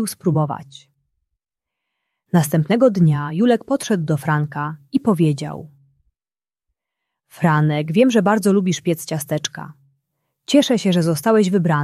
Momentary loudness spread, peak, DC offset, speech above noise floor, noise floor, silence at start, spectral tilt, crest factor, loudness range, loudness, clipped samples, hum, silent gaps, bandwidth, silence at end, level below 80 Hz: 11 LU; -2 dBFS; under 0.1%; over 73 dB; under -90 dBFS; 0 s; -6 dB/octave; 16 dB; 4 LU; -18 LUFS; under 0.1%; none; none; 15 kHz; 0 s; -60 dBFS